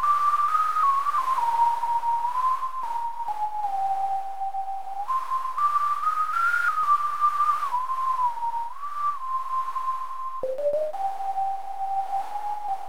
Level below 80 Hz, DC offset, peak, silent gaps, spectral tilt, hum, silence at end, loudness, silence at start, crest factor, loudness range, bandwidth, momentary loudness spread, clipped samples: -76 dBFS; 2%; -12 dBFS; none; -2 dB/octave; none; 0 s; -26 LUFS; 0 s; 14 dB; 5 LU; 18 kHz; 9 LU; under 0.1%